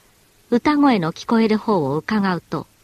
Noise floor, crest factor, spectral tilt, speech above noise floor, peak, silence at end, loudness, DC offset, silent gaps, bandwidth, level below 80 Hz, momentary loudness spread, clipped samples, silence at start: -55 dBFS; 16 dB; -7 dB/octave; 36 dB; -4 dBFS; 0.2 s; -19 LUFS; under 0.1%; none; 13.5 kHz; -54 dBFS; 7 LU; under 0.1%; 0.5 s